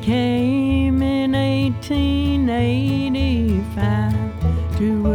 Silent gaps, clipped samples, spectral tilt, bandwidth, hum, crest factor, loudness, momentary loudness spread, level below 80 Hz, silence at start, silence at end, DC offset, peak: none; under 0.1%; -8 dB/octave; 12.5 kHz; none; 10 dB; -19 LUFS; 3 LU; -28 dBFS; 0 s; 0 s; under 0.1%; -8 dBFS